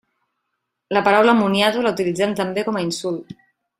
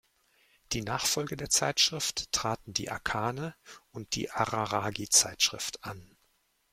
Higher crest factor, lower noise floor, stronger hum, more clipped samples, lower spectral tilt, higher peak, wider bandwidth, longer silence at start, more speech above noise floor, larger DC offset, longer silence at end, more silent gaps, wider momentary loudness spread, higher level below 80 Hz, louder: second, 18 dB vs 24 dB; first, -77 dBFS vs -72 dBFS; neither; neither; first, -5 dB/octave vs -1.5 dB/octave; first, -2 dBFS vs -8 dBFS; about the same, 15.5 kHz vs 16.5 kHz; first, 0.9 s vs 0.7 s; first, 58 dB vs 41 dB; neither; second, 0.45 s vs 0.65 s; neither; second, 10 LU vs 17 LU; about the same, -62 dBFS vs -58 dBFS; first, -19 LUFS vs -29 LUFS